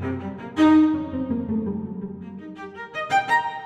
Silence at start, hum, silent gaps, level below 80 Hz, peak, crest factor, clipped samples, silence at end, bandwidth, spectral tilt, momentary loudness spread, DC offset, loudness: 0 s; none; none; -54 dBFS; -8 dBFS; 14 dB; under 0.1%; 0 s; 9 kHz; -6.5 dB/octave; 20 LU; under 0.1%; -22 LUFS